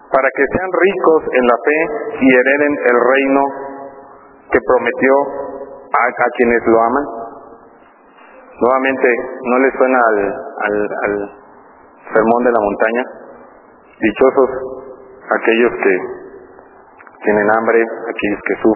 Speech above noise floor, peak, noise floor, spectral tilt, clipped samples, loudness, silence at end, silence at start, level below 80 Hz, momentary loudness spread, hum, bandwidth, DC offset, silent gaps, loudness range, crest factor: 31 dB; 0 dBFS; -45 dBFS; -9 dB/octave; under 0.1%; -14 LUFS; 0 s; 0.1 s; -48 dBFS; 14 LU; none; 4 kHz; under 0.1%; none; 4 LU; 16 dB